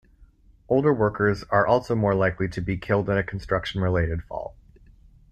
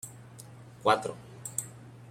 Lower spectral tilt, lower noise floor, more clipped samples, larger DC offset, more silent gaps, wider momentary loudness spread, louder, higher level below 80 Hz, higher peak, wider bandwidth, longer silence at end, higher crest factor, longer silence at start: first, -8 dB/octave vs -3 dB/octave; first, -54 dBFS vs -49 dBFS; neither; neither; neither; second, 9 LU vs 22 LU; first, -24 LUFS vs -31 LUFS; first, -44 dBFS vs -70 dBFS; first, -6 dBFS vs -12 dBFS; second, 9.2 kHz vs 16 kHz; first, 0.8 s vs 0 s; second, 18 dB vs 24 dB; first, 0.7 s vs 0.05 s